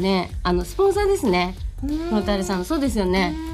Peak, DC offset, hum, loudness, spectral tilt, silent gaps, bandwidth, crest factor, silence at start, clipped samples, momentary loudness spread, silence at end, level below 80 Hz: -10 dBFS; under 0.1%; none; -22 LUFS; -5.5 dB/octave; none; 15.5 kHz; 12 dB; 0 s; under 0.1%; 7 LU; 0 s; -32 dBFS